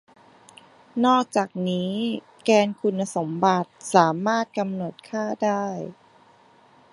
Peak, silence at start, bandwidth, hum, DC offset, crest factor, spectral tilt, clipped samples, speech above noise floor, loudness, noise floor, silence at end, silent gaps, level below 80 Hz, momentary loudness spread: -2 dBFS; 0.95 s; 11.5 kHz; none; under 0.1%; 22 dB; -5.5 dB/octave; under 0.1%; 32 dB; -23 LUFS; -55 dBFS; 1 s; none; -72 dBFS; 11 LU